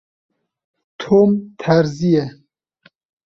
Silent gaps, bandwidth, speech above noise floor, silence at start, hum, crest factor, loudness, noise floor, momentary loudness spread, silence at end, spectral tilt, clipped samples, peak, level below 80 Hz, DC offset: none; 7.4 kHz; 40 dB; 1 s; none; 18 dB; -16 LUFS; -56 dBFS; 13 LU; 0.95 s; -7.5 dB/octave; under 0.1%; -2 dBFS; -56 dBFS; under 0.1%